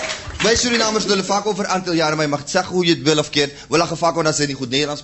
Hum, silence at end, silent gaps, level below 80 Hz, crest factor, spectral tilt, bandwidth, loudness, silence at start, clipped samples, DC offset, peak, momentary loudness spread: none; 0 s; none; -44 dBFS; 18 dB; -3.5 dB/octave; 8.4 kHz; -18 LUFS; 0 s; under 0.1%; under 0.1%; -2 dBFS; 5 LU